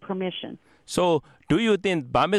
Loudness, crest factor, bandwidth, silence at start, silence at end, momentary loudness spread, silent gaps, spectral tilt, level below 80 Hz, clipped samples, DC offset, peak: -24 LUFS; 16 dB; 13 kHz; 0 s; 0 s; 10 LU; none; -5.5 dB/octave; -52 dBFS; under 0.1%; under 0.1%; -8 dBFS